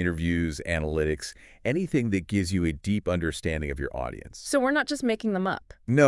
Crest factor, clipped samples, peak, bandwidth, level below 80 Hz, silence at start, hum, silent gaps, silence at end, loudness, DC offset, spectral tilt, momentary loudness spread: 22 dB; under 0.1%; -6 dBFS; 12 kHz; -44 dBFS; 0 s; none; none; 0 s; -28 LUFS; under 0.1%; -6 dB/octave; 8 LU